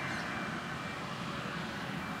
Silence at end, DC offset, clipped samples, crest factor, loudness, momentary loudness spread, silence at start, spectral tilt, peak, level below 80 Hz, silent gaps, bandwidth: 0 s; under 0.1%; under 0.1%; 14 dB; -38 LUFS; 3 LU; 0 s; -4.5 dB/octave; -26 dBFS; -62 dBFS; none; 16 kHz